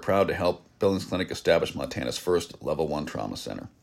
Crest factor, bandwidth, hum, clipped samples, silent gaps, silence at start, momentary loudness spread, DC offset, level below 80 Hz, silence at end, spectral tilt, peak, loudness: 18 dB; 16 kHz; none; under 0.1%; none; 0 s; 9 LU; under 0.1%; -52 dBFS; 0.15 s; -5 dB/octave; -8 dBFS; -28 LUFS